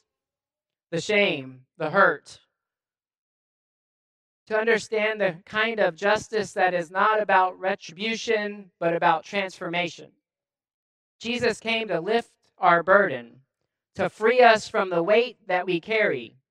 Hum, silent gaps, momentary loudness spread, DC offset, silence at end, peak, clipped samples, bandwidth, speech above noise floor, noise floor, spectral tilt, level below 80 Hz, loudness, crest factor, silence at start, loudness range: none; 3.17-4.46 s, 10.74-11.19 s; 10 LU; under 0.1%; 0.2 s; -2 dBFS; under 0.1%; 11 kHz; over 66 dB; under -90 dBFS; -4 dB/octave; -68 dBFS; -23 LUFS; 22 dB; 0.9 s; 6 LU